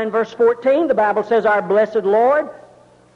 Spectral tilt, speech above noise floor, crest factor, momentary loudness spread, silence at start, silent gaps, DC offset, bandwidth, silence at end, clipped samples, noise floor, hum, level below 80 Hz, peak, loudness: -6.5 dB/octave; 32 dB; 10 dB; 4 LU; 0 s; none; under 0.1%; 7 kHz; 0.6 s; under 0.1%; -48 dBFS; none; -60 dBFS; -6 dBFS; -16 LUFS